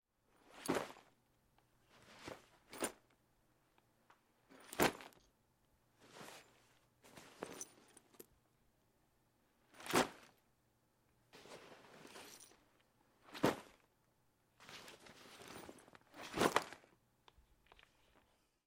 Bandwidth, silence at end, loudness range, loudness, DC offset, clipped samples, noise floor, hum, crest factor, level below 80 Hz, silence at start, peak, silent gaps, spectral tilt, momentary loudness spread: 16.5 kHz; 1.9 s; 13 LU; -42 LUFS; under 0.1%; under 0.1%; -78 dBFS; none; 32 dB; -76 dBFS; 0.55 s; -16 dBFS; none; -3.5 dB/octave; 26 LU